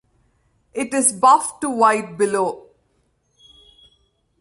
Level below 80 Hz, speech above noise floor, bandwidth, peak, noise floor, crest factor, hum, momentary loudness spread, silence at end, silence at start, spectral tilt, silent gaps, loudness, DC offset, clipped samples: -64 dBFS; 48 dB; 12 kHz; -2 dBFS; -65 dBFS; 18 dB; none; 13 LU; 1.8 s; 0.75 s; -3 dB/octave; none; -18 LUFS; under 0.1%; under 0.1%